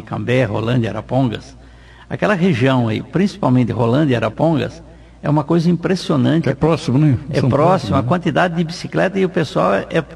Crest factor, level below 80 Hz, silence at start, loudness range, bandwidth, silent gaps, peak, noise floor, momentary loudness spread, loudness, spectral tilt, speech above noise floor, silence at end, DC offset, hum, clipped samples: 14 dB; -42 dBFS; 0 s; 2 LU; 11.5 kHz; none; -2 dBFS; -41 dBFS; 5 LU; -17 LUFS; -7.5 dB/octave; 25 dB; 0 s; under 0.1%; none; under 0.1%